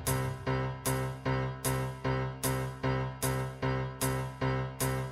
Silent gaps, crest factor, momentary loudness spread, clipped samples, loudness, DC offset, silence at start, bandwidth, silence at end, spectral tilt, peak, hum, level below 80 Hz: none; 16 dB; 1 LU; under 0.1%; -33 LUFS; under 0.1%; 0 s; 16 kHz; 0 s; -5 dB/octave; -18 dBFS; none; -46 dBFS